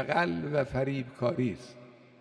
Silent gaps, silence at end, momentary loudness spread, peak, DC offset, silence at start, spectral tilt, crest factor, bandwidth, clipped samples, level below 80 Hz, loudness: none; 0.25 s; 9 LU; -14 dBFS; under 0.1%; 0 s; -7.5 dB/octave; 18 dB; 10.5 kHz; under 0.1%; -58 dBFS; -31 LUFS